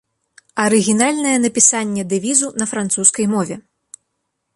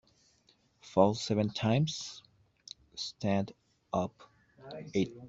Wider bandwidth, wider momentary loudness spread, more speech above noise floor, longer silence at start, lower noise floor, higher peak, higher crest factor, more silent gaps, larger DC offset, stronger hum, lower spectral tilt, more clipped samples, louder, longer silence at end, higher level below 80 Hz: first, 11.5 kHz vs 8 kHz; second, 9 LU vs 19 LU; first, 57 dB vs 37 dB; second, 0.55 s vs 0.85 s; first, -73 dBFS vs -69 dBFS; first, 0 dBFS vs -10 dBFS; second, 18 dB vs 24 dB; neither; neither; neither; second, -3 dB/octave vs -6 dB/octave; neither; first, -15 LUFS vs -33 LUFS; first, 0.95 s vs 0 s; about the same, -62 dBFS vs -66 dBFS